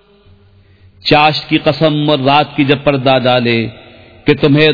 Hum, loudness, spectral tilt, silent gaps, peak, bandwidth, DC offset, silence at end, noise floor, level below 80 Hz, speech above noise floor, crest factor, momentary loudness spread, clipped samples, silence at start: none; -12 LUFS; -7.5 dB/octave; none; 0 dBFS; 5.4 kHz; 0.4%; 0 s; -45 dBFS; -44 dBFS; 35 dB; 12 dB; 6 LU; 0.2%; 1.05 s